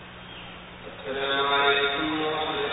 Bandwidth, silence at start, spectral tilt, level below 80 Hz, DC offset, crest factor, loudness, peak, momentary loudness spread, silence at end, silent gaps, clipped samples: 4 kHz; 0 s; -8 dB/octave; -54 dBFS; under 0.1%; 18 dB; -24 LUFS; -8 dBFS; 20 LU; 0 s; none; under 0.1%